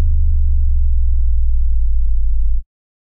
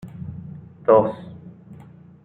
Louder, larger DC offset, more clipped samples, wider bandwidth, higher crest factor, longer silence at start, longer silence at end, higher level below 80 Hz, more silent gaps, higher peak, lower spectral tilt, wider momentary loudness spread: about the same, -20 LUFS vs -19 LUFS; neither; neither; second, 0.2 kHz vs 4.1 kHz; second, 6 dB vs 20 dB; about the same, 0 s vs 0.05 s; about the same, 0.45 s vs 0.5 s; first, -12 dBFS vs -60 dBFS; neither; about the same, -6 dBFS vs -4 dBFS; first, -15 dB/octave vs -10 dB/octave; second, 3 LU vs 25 LU